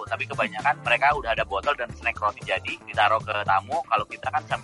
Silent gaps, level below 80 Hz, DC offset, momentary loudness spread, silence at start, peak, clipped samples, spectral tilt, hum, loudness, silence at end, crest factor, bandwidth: none; -50 dBFS; under 0.1%; 7 LU; 0 s; -8 dBFS; under 0.1%; -4 dB/octave; none; -24 LUFS; 0 s; 18 dB; 11.5 kHz